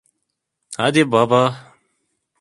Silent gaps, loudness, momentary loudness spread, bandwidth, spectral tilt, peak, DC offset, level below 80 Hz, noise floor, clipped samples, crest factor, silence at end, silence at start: none; -17 LUFS; 18 LU; 11.5 kHz; -5.5 dB/octave; 0 dBFS; under 0.1%; -62 dBFS; -76 dBFS; under 0.1%; 20 dB; 0.8 s; 0.7 s